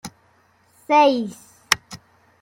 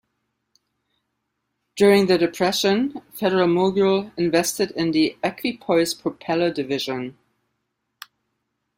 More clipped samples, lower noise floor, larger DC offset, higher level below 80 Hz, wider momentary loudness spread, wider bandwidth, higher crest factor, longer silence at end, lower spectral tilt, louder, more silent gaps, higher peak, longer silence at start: neither; second, -59 dBFS vs -77 dBFS; neither; about the same, -62 dBFS vs -62 dBFS; first, 25 LU vs 11 LU; about the same, 16.5 kHz vs 16 kHz; about the same, 22 dB vs 20 dB; second, 0.45 s vs 1.65 s; second, -2.5 dB/octave vs -4.5 dB/octave; about the same, -19 LUFS vs -21 LUFS; neither; first, 0 dBFS vs -4 dBFS; second, 0.05 s vs 1.75 s